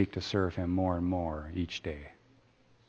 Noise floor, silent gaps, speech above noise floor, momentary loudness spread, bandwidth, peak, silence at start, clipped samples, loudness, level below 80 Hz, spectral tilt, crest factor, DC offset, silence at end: -65 dBFS; none; 32 dB; 11 LU; 7.4 kHz; -14 dBFS; 0 s; under 0.1%; -33 LUFS; -50 dBFS; -7 dB/octave; 20 dB; under 0.1%; 0.75 s